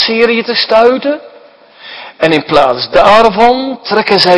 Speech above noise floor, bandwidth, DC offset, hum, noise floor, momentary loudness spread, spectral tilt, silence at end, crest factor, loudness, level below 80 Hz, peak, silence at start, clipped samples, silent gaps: 30 dB; 11 kHz; under 0.1%; none; -39 dBFS; 13 LU; -5 dB/octave; 0 s; 10 dB; -9 LUFS; -40 dBFS; 0 dBFS; 0 s; 2%; none